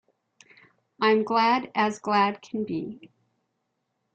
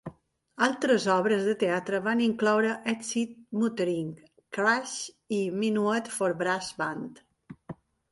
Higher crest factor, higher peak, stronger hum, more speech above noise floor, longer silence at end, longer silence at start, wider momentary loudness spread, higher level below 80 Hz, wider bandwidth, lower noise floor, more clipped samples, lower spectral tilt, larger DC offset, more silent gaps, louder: about the same, 18 dB vs 18 dB; about the same, -10 dBFS vs -10 dBFS; neither; first, 53 dB vs 20 dB; first, 1.1 s vs 0.4 s; first, 1 s vs 0.05 s; second, 11 LU vs 14 LU; about the same, -72 dBFS vs -70 dBFS; second, 8.8 kHz vs 11.5 kHz; first, -78 dBFS vs -48 dBFS; neither; about the same, -5 dB/octave vs -4.5 dB/octave; neither; neither; first, -25 LUFS vs -28 LUFS